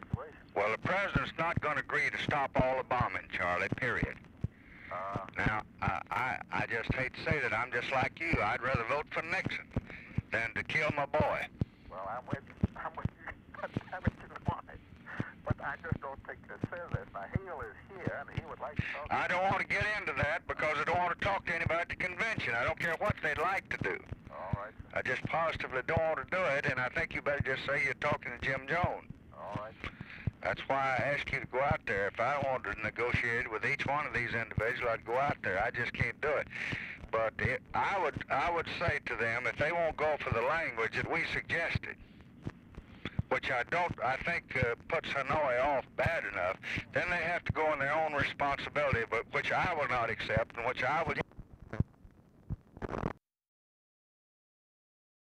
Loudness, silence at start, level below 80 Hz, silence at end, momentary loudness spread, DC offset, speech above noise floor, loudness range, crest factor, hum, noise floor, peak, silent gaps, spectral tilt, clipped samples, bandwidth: -34 LUFS; 0 s; -52 dBFS; 2.2 s; 11 LU; under 0.1%; 25 dB; 8 LU; 20 dB; none; -59 dBFS; -14 dBFS; none; -6 dB/octave; under 0.1%; 13 kHz